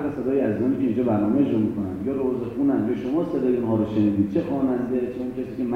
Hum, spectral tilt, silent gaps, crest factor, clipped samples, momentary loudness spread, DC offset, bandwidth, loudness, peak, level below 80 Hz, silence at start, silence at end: none; -9.5 dB/octave; none; 14 dB; under 0.1%; 6 LU; under 0.1%; 6.2 kHz; -23 LUFS; -10 dBFS; -52 dBFS; 0 s; 0 s